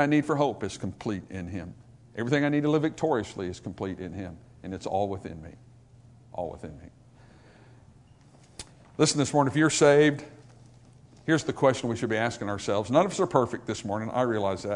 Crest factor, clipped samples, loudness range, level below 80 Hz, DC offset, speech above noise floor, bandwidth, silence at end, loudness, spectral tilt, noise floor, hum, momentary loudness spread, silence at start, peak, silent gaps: 22 dB; under 0.1%; 12 LU; -60 dBFS; under 0.1%; 29 dB; 11 kHz; 0 s; -27 LUFS; -5 dB/octave; -55 dBFS; none; 19 LU; 0 s; -6 dBFS; none